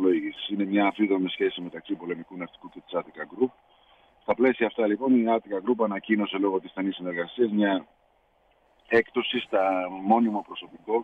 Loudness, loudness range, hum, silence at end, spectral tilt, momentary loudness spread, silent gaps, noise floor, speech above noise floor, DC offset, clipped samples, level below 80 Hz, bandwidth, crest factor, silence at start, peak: -26 LUFS; 4 LU; none; 0 s; -8 dB/octave; 12 LU; none; -65 dBFS; 39 dB; under 0.1%; under 0.1%; -70 dBFS; 4.9 kHz; 18 dB; 0 s; -8 dBFS